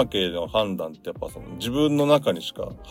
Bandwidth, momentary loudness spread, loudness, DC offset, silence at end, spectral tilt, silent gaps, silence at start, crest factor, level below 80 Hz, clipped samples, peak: 16.5 kHz; 15 LU; -24 LUFS; under 0.1%; 0 s; -5.5 dB/octave; none; 0 s; 18 dB; -48 dBFS; under 0.1%; -6 dBFS